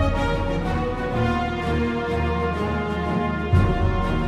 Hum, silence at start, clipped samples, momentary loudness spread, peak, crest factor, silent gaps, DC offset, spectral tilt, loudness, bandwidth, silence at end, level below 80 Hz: none; 0 s; under 0.1%; 4 LU; -6 dBFS; 16 dB; none; under 0.1%; -7.5 dB/octave; -23 LUFS; 10.5 kHz; 0 s; -30 dBFS